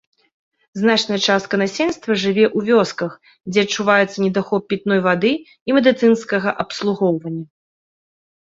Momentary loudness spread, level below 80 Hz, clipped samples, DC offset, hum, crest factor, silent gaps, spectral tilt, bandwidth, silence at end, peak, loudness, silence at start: 9 LU; -60 dBFS; under 0.1%; under 0.1%; none; 18 dB; 5.61-5.66 s; -5 dB/octave; 7.8 kHz; 1.05 s; -2 dBFS; -18 LUFS; 0.75 s